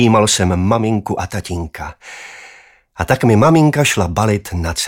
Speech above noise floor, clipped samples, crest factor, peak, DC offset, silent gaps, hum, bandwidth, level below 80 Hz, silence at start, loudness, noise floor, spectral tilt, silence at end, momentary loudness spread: 30 dB; under 0.1%; 14 dB; 0 dBFS; under 0.1%; none; none; 17 kHz; -38 dBFS; 0 s; -15 LUFS; -45 dBFS; -5 dB/octave; 0 s; 19 LU